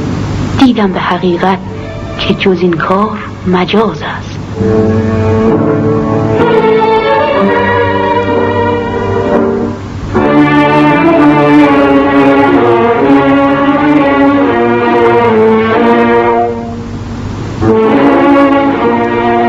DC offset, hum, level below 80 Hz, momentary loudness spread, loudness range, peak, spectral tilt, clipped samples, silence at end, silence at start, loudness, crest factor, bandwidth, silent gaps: 0.2%; none; -32 dBFS; 10 LU; 4 LU; 0 dBFS; -7.5 dB/octave; under 0.1%; 0 s; 0 s; -9 LUFS; 8 dB; 7.8 kHz; none